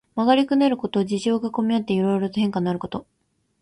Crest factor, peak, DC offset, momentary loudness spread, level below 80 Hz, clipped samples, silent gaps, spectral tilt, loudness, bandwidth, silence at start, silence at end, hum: 18 dB; -4 dBFS; under 0.1%; 8 LU; -60 dBFS; under 0.1%; none; -6.5 dB/octave; -22 LUFS; 11 kHz; 0.15 s; 0.6 s; none